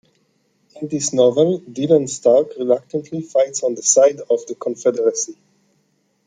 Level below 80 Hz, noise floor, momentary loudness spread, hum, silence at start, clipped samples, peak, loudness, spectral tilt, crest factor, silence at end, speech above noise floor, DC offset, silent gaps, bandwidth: -68 dBFS; -64 dBFS; 12 LU; none; 0.75 s; under 0.1%; -2 dBFS; -18 LUFS; -4.5 dB/octave; 16 dB; 0.95 s; 47 dB; under 0.1%; none; 9.6 kHz